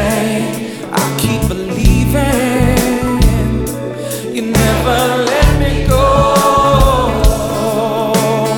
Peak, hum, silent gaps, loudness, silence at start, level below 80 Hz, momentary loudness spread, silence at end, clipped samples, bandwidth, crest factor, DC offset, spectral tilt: 0 dBFS; none; none; -13 LUFS; 0 s; -18 dBFS; 9 LU; 0 s; under 0.1%; 18.5 kHz; 12 dB; under 0.1%; -5.5 dB/octave